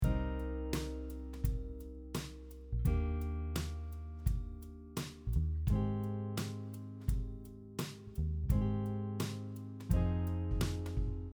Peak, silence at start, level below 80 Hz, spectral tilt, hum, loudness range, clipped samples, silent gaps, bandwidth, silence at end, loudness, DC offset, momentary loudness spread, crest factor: -18 dBFS; 0 s; -40 dBFS; -7 dB/octave; none; 3 LU; under 0.1%; none; over 20 kHz; 0.05 s; -39 LUFS; under 0.1%; 11 LU; 18 dB